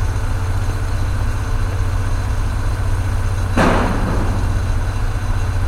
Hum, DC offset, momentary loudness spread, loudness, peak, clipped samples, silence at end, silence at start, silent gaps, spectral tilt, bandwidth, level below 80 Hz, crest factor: none; under 0.1%; 6 LU; -20 LUFS; -2 dBFS; under 0.1%; 0 s; 0 s; none; -6.5 dB/octave; 13.5 kHz; -20 dBFS; 16 dB